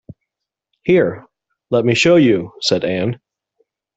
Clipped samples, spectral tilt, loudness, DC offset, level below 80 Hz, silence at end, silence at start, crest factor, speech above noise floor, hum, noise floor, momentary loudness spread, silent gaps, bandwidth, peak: under 0.1%; -5.5 dB/octave; -16 LUFS; under 0.1%; -56 dBFS; 0.8 s; 0.85 s; 16 dB; 67 dB; none; -81 dBFS; 14 LU; none; 8.2 kHz; -2 dBFS